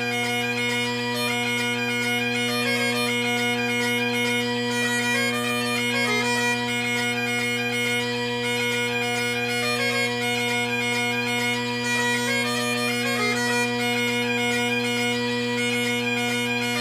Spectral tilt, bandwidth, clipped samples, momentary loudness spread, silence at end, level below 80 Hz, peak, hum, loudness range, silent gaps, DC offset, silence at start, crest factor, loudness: -3 dB/octave; 16 kHz; under 0.1%; 2 LU; 0 s; -62 dBFS; -10 dBFS; none; 1 LU; none; under 0.1%; 0 s; 14 dB; -23 LUFS